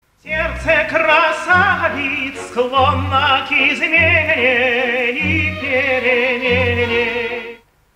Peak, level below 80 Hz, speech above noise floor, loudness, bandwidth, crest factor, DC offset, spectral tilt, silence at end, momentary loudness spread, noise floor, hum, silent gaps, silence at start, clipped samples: -2 dBFS; -40 dBFS; 21 dB; -15 LUFS; 15 kHz; 14 dB; under 0.1%; -5 dB/octave; 0.4 s; 8 LU; -37 dBFS; none; none; 0.25 s; under 0.1%